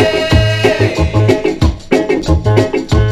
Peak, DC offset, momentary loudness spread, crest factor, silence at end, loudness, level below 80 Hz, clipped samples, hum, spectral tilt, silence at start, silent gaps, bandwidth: 0 dBFS; under 0.1%; 3 LU; 12 dB; 0 s; -12 LUFS; -20 dBFS; 0.1%; none; -6.5 dB/octave; 0 s; none; 12.5 kHz